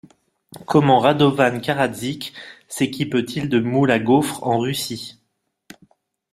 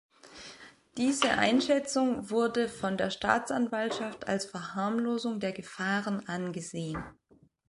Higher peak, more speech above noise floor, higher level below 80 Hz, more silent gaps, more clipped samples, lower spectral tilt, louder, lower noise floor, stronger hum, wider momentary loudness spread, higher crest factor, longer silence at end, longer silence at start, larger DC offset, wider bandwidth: first, -2 dBFS vs -8 dBFS; first, 53 dB vs 22 dB; about the same, -58 dBFS vs -62 dBFS; neither; neither; first, -5.5 dB/octave vs -4 dB/octave; first, -19 LUFS vs -30 LUFS; first, -72 dBFS vs -52 dBFS; neither; about the same, 17 LU vs 15 LU; about the same, 18 dB vs 22 dB; first, 1.2 s vs 0.6 s; first, 0.55 s vs 0.25 s; neither; first, 15.5 kHz vs 11.5 kHz